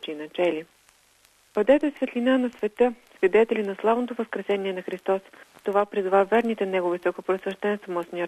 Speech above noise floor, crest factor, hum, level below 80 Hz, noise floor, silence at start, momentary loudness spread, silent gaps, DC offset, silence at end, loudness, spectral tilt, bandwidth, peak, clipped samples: 36 dB; 18 dB; none; -66 dBFS; -60 dBFS; 0.05 s; 10 LU; none; under 0.1%; 0 s; -25 LUFS; -6.5 dB/octave; 13 kHz; -6 dBFS; under 0.1%